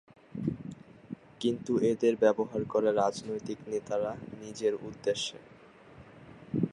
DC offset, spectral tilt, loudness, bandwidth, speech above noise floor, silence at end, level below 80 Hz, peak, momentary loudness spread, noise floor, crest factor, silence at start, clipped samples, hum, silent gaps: under 0.1%; -5.5 dB/octave; -31 LUFS; 11.5 kHz; 23 dB; 0 s; -66 dBFS; -12 dBFS; 20 LU; -54 dBFS; 20 dB; 0.35 s; under 0.1%; none; none